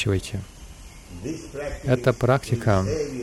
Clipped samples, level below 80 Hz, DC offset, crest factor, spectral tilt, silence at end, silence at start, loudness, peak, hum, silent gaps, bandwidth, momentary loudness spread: under 0.1%; -42 dBFS; under 0.1%; 18 dB; -6.5 dB/octave; 0 s; 0 s; -24 LUFS; -6 dBFS; none; none; 14 kHz; 21 LU